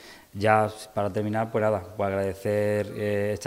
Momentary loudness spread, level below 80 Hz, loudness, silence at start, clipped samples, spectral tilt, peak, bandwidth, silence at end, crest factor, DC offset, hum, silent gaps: 7 LU; -62 dBFS; -26 LUFS; 0 s; under 0.1%; -6.5 dB/octave; -4 dBFS; 16 kHz; 0 s; 22 dB; under 0.1%; none; none